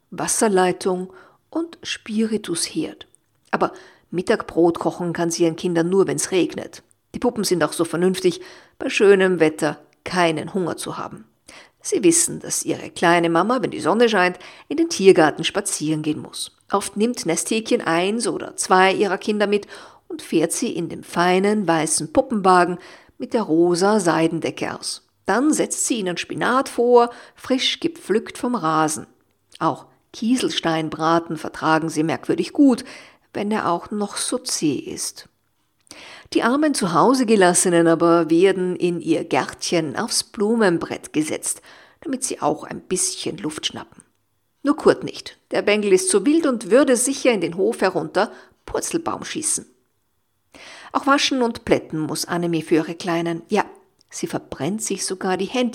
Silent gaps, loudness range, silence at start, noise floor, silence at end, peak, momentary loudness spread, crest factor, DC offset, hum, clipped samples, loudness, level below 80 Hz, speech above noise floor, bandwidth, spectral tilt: none; 6 LU; 0.1 s; -71 dBFS; 0 s; 0 dBFS; 12 LU; 20 dB; under 0.1%; none; under 0.1%; -20 LUFS; -60 dBFS; 51 dB; 16.5 kHz; -4 dB/octave